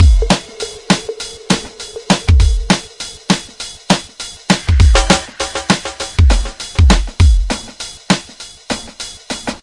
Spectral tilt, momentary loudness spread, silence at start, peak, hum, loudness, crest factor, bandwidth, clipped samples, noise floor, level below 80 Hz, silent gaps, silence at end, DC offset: -4.5 dB/octave; 16 LU; 0 s; 0 dBFS; none; -15 LUFS; 14 dB; 11.5 kHz; under 0.1%; -35 dBFS; -18 dBFS; none; 0.05 s; under 0.1%